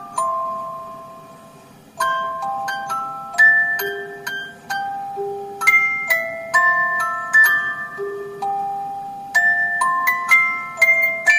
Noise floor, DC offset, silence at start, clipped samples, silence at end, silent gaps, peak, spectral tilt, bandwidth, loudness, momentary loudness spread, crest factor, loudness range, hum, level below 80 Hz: -44 dBFS; under 0.1%; 0 s; under 0.1%; 0 s; none; -2 dBFS; -1.5 dB/octave; 15.5 kHz; -17 LUFS; 15 LU; 18 dB; 3 LU; none; -66 dBFS